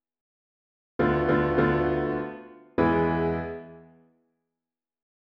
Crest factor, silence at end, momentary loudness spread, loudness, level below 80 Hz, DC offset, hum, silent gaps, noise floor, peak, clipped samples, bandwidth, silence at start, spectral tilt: 20 dB; 1.55 s; 15 LU; -25 LUFS; -46 dBFS; under 0.1%; none; none; under -90 dBFS; -8 dBFS; under 0.1%; 5.4 kHz; 1 s; -9.5 dB/octave